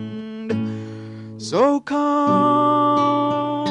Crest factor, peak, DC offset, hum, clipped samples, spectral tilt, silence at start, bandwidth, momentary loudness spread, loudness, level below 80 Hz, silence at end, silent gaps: 14 dB; -6 dBFS; under 0.1%; none; under 0.1%; -6.5 dB/octave; 0 s; 10.5 kHz; 16 LU; -19 LUFS; -62 dBFS; 0 s; none